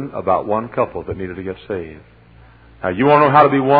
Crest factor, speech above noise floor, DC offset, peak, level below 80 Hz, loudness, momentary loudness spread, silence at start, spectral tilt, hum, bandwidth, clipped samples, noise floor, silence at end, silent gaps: 16 dB; 29 dB; under 0.1%; 0 dBFS; -48 dBFS; -16 LUFS; 16 LU; 0 s; -10 dB/octave; none; 5 kHz; under 0.1%; -45 dBFS; 0 s; none